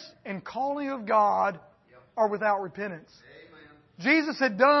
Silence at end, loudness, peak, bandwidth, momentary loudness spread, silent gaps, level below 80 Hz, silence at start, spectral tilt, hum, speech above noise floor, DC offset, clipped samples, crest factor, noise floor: 0 s; -26 LUFS; -8 dBFS; 6.2 kHz; 15 LU; none; -74 dBFS; 0 s; -5.5 dB/octave; none; 28 dB; under 0.1%; under 0.1%; 20 dB; -54 dBFS